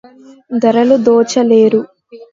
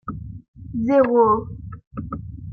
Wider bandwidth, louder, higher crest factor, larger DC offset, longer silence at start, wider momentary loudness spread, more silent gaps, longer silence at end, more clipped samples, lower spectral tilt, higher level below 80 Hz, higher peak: first, 7.8 kHz vs 6.2 kHz; first, -11 LUFS vs -18 LUFS; about the same, 12 dB vs 16 dB; neither; first, 0.5 s vs 0.05 s; second, 10 LU vs 21 LU; second, none vs 0.48-0.54 s, 1.87-1.91 s; about the same, 0.1 s vs 0 s; neither; second, -5.5 dB/octave vs -10 dB/octave; second, -60 dBFS vs -44 dBFS; first, 0 dBFS vs -6 dBFS